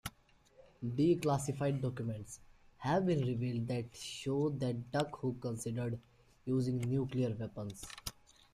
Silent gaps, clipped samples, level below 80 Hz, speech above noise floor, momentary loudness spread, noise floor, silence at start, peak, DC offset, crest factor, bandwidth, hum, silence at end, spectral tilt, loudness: none; under 0.1%; -64 dBFS; 31 dB; 13 LU; -67 dBFS; 0.05 s; -20 dBFS; under 0.1%; 18 dB; 15.5 kHz; none; 0.4 s; -6.5 dB/octave; -37 LUFS